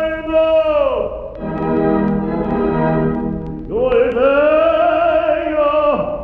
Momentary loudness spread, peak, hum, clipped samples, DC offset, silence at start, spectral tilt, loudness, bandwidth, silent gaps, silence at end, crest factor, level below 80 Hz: 9 LU; -4 dBFS; none; under 0.1%; under 0.1%; 0 s; -9.5 dB/octave; -16 LUFS; 4.8 kHz; none; 0 s; 12 dB; -36 dBFS